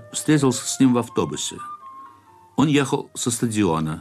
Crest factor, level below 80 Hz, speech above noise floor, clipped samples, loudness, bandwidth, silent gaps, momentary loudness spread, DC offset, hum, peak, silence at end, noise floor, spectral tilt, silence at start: 14 dB; -54 dBFS; 29 dB; under 0.1%; -21 LUFS; 14.5 kHz; none; 15 LU; under 0.1%; none; -8 dBFS; 0 s; -50 dBFS; -5 dB/octave; 0 s